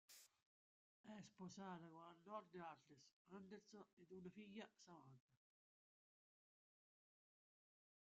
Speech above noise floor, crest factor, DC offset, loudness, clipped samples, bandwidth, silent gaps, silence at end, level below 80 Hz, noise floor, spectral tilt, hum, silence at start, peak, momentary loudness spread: over 29 dB; 22 dB; under 0.1%; -61 LUFS; under 0.1%; 7.4 kHz; 0.42-1.04 s, 3.13-3.25 s, 3.93-3.97 s, 5.20-5.28 s; 2.75 s; under -90 dBFS; under -90 dBFS; -5 dB/octave; none; 0.1 s; -42 dBFS; 9 LU